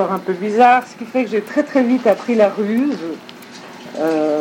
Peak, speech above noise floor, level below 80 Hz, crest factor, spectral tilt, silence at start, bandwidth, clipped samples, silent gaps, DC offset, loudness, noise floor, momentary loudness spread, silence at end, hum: 0 dBFS; 20 dB; -72 dBFS; 16 dB; -6 dB/octave; 0 s; 17 kHz; under 0.1%; none; under 0.1%; -17 LUFS; -36 dBFS; 20 LU; 0 s; none